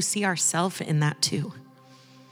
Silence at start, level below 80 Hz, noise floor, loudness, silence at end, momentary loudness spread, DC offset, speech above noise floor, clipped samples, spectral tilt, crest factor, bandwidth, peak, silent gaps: 0 s; -82 dBFS; -52 dBFS; -25 LUFS; 0.35 s; 7 LU; under 0.1%; 26 dB; under 0.1%; -3.5 dB/octave; 18 dB; over 20 kHz; -8 dBFS; none